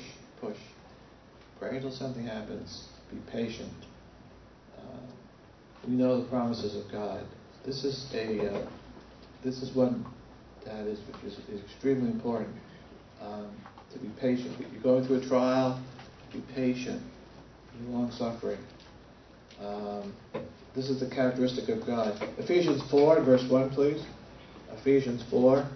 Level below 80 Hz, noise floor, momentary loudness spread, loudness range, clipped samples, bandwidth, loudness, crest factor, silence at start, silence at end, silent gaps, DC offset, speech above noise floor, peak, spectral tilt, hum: -60 dBFS; -54 dBFS; 22 LU; 13 LU; under 0.1%; 6.4 kHz; -30 LUFS; 22 dB; 0 s; 0 s; none; under 0.1%; 25 dB; -10 dBFS; -7 dB/octave; none